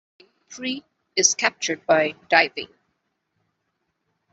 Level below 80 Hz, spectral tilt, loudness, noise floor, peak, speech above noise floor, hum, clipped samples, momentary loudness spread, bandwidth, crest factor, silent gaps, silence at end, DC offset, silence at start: -70 dBFS; -1 dB/octave; -21 LUFS; -75 dBFS; -2 dBFS; 53 dB; none; under 0.1%; 15 LU; 8.2 kHz; 24 dB; none; 1.7 s; under 0.1%; 0.5 s